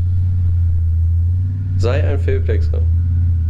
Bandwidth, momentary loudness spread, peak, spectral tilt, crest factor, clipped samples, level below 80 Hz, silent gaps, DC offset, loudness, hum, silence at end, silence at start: 5.4 kHz; 2 LU; -4 dBFS; -9 dB/octave; 10 dB; under 0.1%; -26 dBFS; none; under 0.1%; -17 LUFS; none; 0 s; 0 s